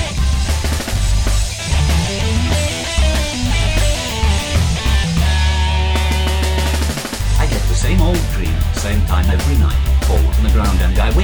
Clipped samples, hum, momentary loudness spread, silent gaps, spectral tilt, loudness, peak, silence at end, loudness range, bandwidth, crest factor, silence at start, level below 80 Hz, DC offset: under 0.1%; none; 4 LU; none; -4.5 dB/octave; -16 LUFS; -2 dBFS; 0 s; 1 LU; over 20 kHz; 12 dB; 0 s; -16 dBFS; 0.8%